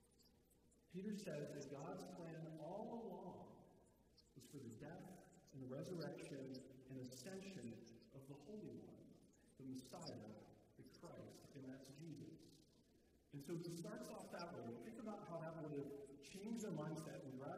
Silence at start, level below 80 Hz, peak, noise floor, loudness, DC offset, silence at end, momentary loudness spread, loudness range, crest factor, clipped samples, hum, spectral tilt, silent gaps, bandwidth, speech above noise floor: 0 s; -82 dBFS; -38 dBFS; -76 dBFS; -55 LUFS; under 0.1%; 0 s; 13 LU; 6 LU; 16 dB; under 0.1%; none; -6 dB/octave; none; 15.5 kHz; 22 dB